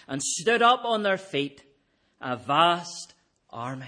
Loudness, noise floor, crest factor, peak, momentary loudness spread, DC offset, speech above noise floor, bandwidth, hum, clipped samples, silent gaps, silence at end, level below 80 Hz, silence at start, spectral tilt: -24 LUFS; -68 dBFS; 20 dB; -6 dBFS; 18 LU; under 0.1%; 42 dB; 10.5 kHz; none; under 0.1%; none; 0 s; -72 dBFS; 0.1 s; -3 dB/octave